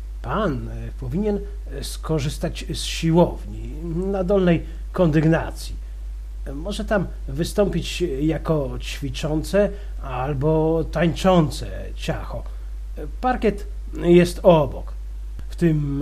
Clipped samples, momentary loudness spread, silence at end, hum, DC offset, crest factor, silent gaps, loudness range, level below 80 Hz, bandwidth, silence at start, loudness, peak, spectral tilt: under 0.1%; 16 LU; 0 s; none; under 0.1%; 20 dB; none; 4 LU; -30 dBFS; 14.5 kHz; 0 s; -22 LUFS; -2 dBFS; -6.5 dB/octave